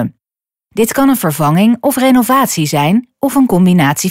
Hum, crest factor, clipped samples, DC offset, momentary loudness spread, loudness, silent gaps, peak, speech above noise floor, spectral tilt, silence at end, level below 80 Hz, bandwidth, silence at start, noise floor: none; 10 dB; under 0.1%; under 0.1%; 6 LU; -11 LUFS; none; -2 dBFS; over 79 dB; -5.5 dB/octave; 0 s; -48 dBFS; 16.5 kHz; 0 s; under -90 dBFS